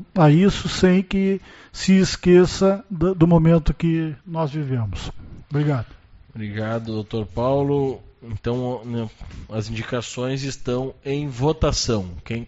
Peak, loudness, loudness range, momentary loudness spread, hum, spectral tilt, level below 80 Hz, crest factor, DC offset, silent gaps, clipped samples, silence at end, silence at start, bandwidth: -2 dBFS; -21 LUFS; 9 LU; 15 LU; none; -6.5 dB/octave; -38 dBFS; 20 dB; under 0.1%; none; under 0.1%; 0 s; 0 s; 8 kHz